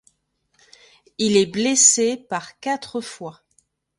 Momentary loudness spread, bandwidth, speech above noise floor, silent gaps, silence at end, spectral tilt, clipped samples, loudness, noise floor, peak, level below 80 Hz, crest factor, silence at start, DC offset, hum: 22 LU; 11.5 kHz; 49 dB; none; 0.7 s; -2 dB/octave; under 0.1%; -19 LUFS; -69 dBFS; 0 dBFS; -64 dBFS; 22 dB; 1.2 s; under 0.1%; none